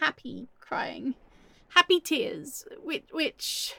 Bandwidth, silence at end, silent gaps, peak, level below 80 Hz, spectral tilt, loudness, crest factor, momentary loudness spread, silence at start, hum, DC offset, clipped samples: 17.5 kHz; 0 s; none; -4 dBFS; -66 dBFS; -2 dB/octave; -28 LUFS; 26 dB; 19 LU; 0 s; none; under 0.1%; under 0.1%